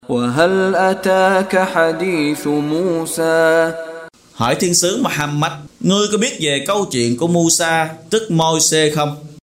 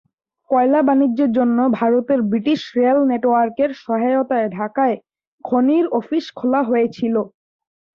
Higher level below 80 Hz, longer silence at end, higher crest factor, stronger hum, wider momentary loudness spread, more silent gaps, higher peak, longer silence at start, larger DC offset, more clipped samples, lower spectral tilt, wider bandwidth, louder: first, -52 dBFS vs -64 dBFS; second, 0.1 s vs 0.65 s; about the same, 16 dB vs 12 dB; neither; about the same, 7 LU vs 6 LU; second, none vs 5.27-5.38 s; first, 0 dBFS vs -4 dBFS; second, 0.1 s vs 0.5 s; neither; neither; second, -3.5 dB/octave vs -7.5 dB/octave; first, 16 kHz vs 6.6 kHz; first, -15 LUFS vs -18 LUFS